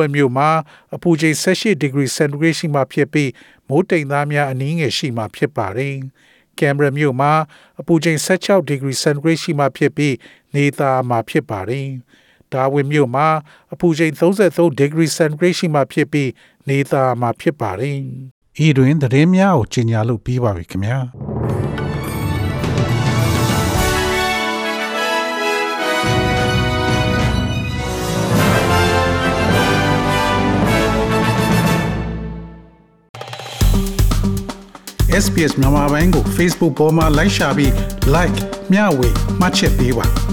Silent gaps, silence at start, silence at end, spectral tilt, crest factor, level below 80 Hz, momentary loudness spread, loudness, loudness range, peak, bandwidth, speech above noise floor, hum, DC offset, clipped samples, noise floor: 18.31-18.42 s, 33.09-33.14 s; 0 s; 0 s; -5.5 dB/octave; 14 dB; -28 dBFS; 9 LU; -16 LUFS; 4 LU; -2 dBFS; 19 kHz; 30 dB; none; under 0.1%; under 0.1%; -46 dBFS